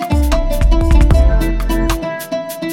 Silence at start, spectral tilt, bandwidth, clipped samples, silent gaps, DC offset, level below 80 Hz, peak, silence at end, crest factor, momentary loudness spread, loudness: 0 s; -6.5 dB/octave; 17 kHz; under 0.1%; none; under 0.1%; -14 dBFS; 0 dBFS; 0 s; 12 dB; 9 LU; -15 LUFS